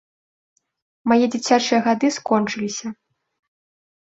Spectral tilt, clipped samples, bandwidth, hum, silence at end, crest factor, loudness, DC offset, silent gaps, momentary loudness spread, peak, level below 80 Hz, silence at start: -4 dB/octave; under 0.1%; 8 kHz; none; 1.2 s; 18 dB; -20 LUFS; under 0.1%; none; 11 LU; -4 dBFS; -66 dBFS; 1.05 s